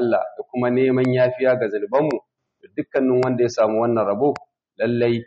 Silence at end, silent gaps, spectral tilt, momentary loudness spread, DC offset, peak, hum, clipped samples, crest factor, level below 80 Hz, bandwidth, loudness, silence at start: 0.05 s; none; -6.5 dB/octave; 9 LU; under 0.1%; -8 dBFS; none; under 0.1%; 12 dB; -64 dBFS; 7.2 kHz; -20 LUFS; 0 s